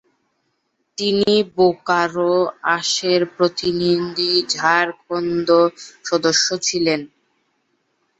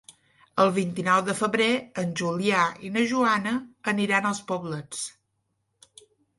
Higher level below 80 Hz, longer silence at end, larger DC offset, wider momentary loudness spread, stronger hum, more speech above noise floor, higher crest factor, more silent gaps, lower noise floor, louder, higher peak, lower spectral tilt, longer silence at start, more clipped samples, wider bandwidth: first, -60 dBFS vs -70 dBFS; second, 1.15 s vs 1.3 s; neither; second, 7 LU vs 10 LU; neither; about the same, 52 dB vs 50 dB; about the same, 18 dB vs 18 dB; neither; second, -70 dBFS vs -76 dBFS; first, -18 LUFS vs -25 LUFS; first, -2 dBFS vs -8 dBFS; about the same, -3.5 dB/octave vs -4.5 dB/octave; first, 1 s vs 0.55 s; neither; second, 8.2 kHz vs 11.5 kHz